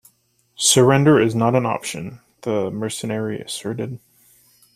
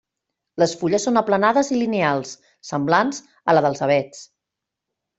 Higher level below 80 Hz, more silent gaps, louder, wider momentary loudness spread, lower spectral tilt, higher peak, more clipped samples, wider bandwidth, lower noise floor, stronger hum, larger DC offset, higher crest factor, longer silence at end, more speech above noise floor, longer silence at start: first, -58 dBFS vs -64 dBFS; neither; about the same, -19 LUFS vs -20 LUFS; first, 18 LU vs 13 LU; about the same, -4.5 dB/octave vs -5 dB/octave; about the same, -2 dBFS vs -2 dBFS; neither; first, 15.5 kHz vs 8.2 kHz; second, -62 dBFS vs -84 dBFS; neither; neither; about the same, 18 dB vs 18 dB; second, 0.8 s vs 0.95 s; second, 43 dB vs 64 dB; about the same, 0.6 s vs 0.55 s